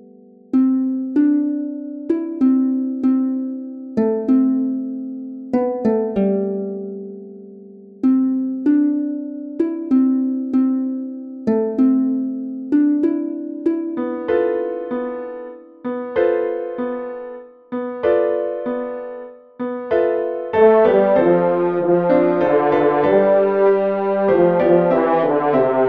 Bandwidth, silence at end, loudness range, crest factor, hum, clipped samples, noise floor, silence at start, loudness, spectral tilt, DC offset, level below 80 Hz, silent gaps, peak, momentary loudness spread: 4.6 kHz; 0 s; 7 LU; 16 dB; none; under 0.1%; -45 dBFS; 0.55 s; -18 LUFS; -10 dB/octave; under 0.1%; -58 dBFS; none; -2 dBFS; 14 LU